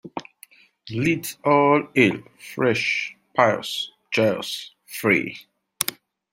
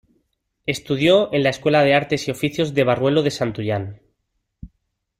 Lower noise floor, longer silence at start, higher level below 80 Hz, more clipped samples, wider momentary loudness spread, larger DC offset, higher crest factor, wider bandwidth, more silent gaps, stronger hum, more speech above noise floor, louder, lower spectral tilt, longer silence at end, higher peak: second, -52 dBFS vs -74 dBFS; second, 0.05 s vs 0.65 s; second, -64 dBFS vs -52 dBFS; neither; first, 16 LU vs 11 LU; neither; first, 24 dB vs 16 dB; about the same, 16.5 kHz vs 16 kHz; neither; neither; second, 31 dB vs 55 dB; second, -22 LUFS vs -19 LUFS; about the same, -4.5 dB/octave vs -5.5 dB/octave; second, 0.4 s vs 0.55 s; first, 0 dBFS vs -4 dBFS